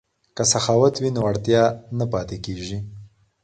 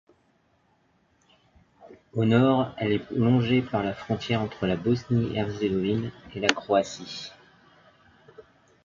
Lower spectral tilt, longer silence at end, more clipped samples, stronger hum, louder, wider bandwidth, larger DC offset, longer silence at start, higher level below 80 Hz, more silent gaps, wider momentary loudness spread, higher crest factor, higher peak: second, -4.5 dB/octave vs -6.5 dB/octave; about the same, 0.35 s vs 0.45 s; neither; neither; first, -21 LUFS vs -26 LUFS; first, 9.4 kHz vs 7.6 kHz; neither; second, 0.35 s vs 1.8 s; first, -48 dBFS vs -56 dBFS; neither; about the same, 14 LU vs 13 LU; second, 18 dB vs 28 dB; second, -4 dBFS vs 0 dBFS